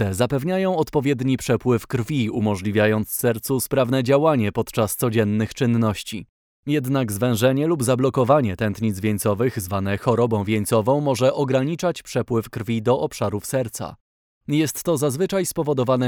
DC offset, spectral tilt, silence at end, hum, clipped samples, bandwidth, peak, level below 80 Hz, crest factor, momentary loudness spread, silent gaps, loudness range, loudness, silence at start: under 0.1%; -6 dB/octave; 0 s; none; under 0.1%; over 20 kHz; -4 dBFS; -52 dBFS; 16 dB; 6 LU; 6.29-6.63 s, 14.01-14.41 s; 3 LU; -21 LUFS; 0 s